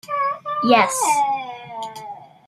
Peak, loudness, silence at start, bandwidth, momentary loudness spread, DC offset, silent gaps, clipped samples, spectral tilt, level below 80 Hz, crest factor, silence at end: -2 dBFS; -19 LUFS; 0.05 s; 15.5 kHz; 17 LU; under 0.1%; none; under 0.1%; -2.5 dB/octave; -70 dBFS; 18 dB; 0.2 s